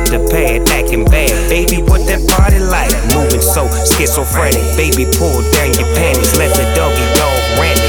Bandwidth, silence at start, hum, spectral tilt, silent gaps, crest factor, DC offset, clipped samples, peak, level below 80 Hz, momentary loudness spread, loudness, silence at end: 19.5 kHz; 0 s; none; -4 dB/octave; none; 10 dB; under 0.1%; under 0.1%; 0 dBFS; -14 dBFS; 2 LU; -11 LUFS; 0 s